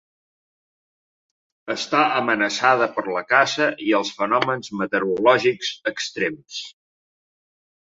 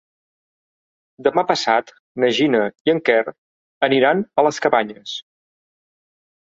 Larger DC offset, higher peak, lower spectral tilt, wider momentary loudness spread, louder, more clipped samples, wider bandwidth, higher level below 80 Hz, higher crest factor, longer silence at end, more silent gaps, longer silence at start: neither; about the same, -2 dBFS vs -2 dBFS; about the same, -3.5 dB/octave vs -4.5 dB/octave; about the same, 12 LU vs 14 LU; about the same, -20 LUFS vs -18 LUFS; neither; about the same, 8 kHz vs 8 kHz; about the same, -68 dBFS vs -66 dBFS; about the same, 20 dB vs 20 dB; second, 1.25 s vs 1.4 s; second, none vs 1.99-2.15 s, 2.80-2.85 s, 3.38-3.81 s; first, 1.65 s vs 1.2 s